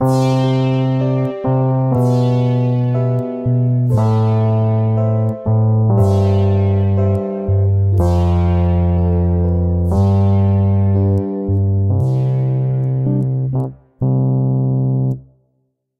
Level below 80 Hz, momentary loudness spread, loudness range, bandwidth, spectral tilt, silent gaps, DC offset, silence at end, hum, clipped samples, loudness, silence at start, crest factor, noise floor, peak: -32 dBFS; 4 LU; 2 LU; 7.6 kHz; -9.5 dB/octave; none; under 0.1%; 0.8 s; none; under 0.1%; -16 LUFS; 0 s; 12 dB; -66 dBFS; -2 dBFS